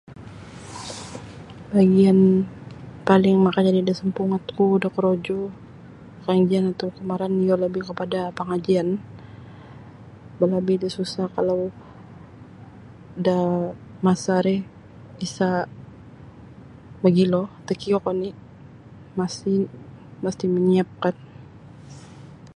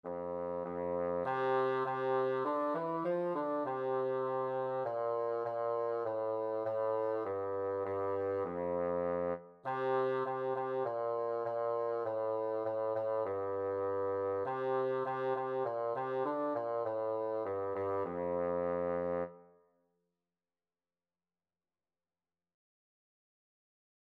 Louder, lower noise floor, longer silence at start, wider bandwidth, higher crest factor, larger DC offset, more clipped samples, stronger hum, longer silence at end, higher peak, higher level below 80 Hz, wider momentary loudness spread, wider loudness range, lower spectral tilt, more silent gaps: first, -22 LUFS vs -36 LUFS; second, -44 dBFS vs under -90 dBFS; about the same, 0.1 s vs 0.05 s; first, 10.5 kHz vs 5.2 kHz; first, 22 dB vs 14 dB; neither; neither; neither; second, 0.1 s vs 4.7 s; first, -2 dBFS vs -22 dBFS; first, -56 dBFS vs -76 dBFS; first, 24 LU vs 3 LU; first, 7 LU vs 3 LU; about the same, -7.5 dB/octave vs -8.5 dB/octave; neither